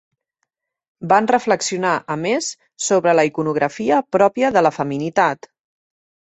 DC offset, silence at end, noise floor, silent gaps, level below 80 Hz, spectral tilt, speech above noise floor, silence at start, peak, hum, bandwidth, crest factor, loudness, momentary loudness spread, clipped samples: under 0.1%; 0.95 s; -76 dBFS; none; -62 dBFS; -4 dB/octave; 58 dB; 1 s; -2 dBFS; none; 8.4 kHz; 18 dB; -18 LUFS; 7 LU; under 0.1%